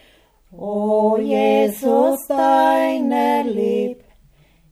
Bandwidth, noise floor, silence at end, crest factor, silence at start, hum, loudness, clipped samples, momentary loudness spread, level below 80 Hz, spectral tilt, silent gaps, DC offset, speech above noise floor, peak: 16 kHz; -54 dBFS; 0.75 s; 14 dB; 0.55 s; none; -18 LUFS; under 0.1%; 8 LU; -58 dBFS; -5.5 dB/octave; none; under 0.1%; 37 dB; -4 dBFS